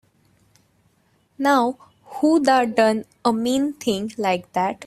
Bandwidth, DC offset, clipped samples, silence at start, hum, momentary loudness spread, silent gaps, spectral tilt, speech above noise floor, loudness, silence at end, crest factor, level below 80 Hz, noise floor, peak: 15.5 kHz; under 0.1%; under 0.1%; 1.4 s; none; 8 LU; none; -4.5 dB/octave; 43 dB; -20 LUFS; 0 s; 18 dB; -64 dBFS; -63 dBFS; -2 dBFS